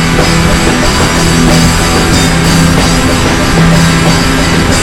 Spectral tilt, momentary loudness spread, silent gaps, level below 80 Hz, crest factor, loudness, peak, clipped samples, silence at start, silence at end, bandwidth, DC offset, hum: -4.5 dB/octave; 2 LU; none; -16 dBFS; 8 dB; -7 LUFS; 0 dBFS; 1%; 0 s; 0 s; 16.5 kHz; under 0.1%; none